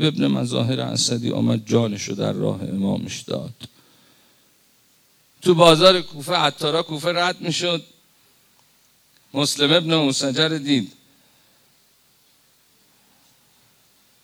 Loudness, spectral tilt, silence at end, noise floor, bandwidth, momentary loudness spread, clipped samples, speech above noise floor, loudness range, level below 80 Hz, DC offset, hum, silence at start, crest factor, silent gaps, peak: -20 LUFS; -4.5 dB/octave; 3.35 s; -58 dBFS; over 20 kHz; 13 LU; under 0.1%; 39 dB; 9 LU; -60 dBFS; under 0.1%; none; 0 s; 22 dB; none; -2 dBFS